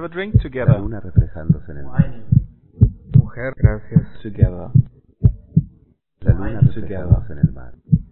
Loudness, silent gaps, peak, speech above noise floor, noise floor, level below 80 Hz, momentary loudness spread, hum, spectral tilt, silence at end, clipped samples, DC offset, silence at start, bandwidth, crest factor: -19 LUFS; none; 0 dBFS; 36 dB; -54 dBFS; -26 dBFS; 5 LU; none; -14 dB/octave; 0 s; under 0.1%; 2%; 0 s; 4 kHz; 18 dB